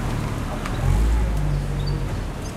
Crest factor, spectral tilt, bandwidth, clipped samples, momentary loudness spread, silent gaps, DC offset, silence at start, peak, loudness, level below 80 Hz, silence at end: 14 dB; -6.5 dB/octave; 14 kHz; under 0.1%; 6 LU; none; under 0.1%; 0 s; -8 dBFS; -25 LUFS; -24 dBFS; 0 s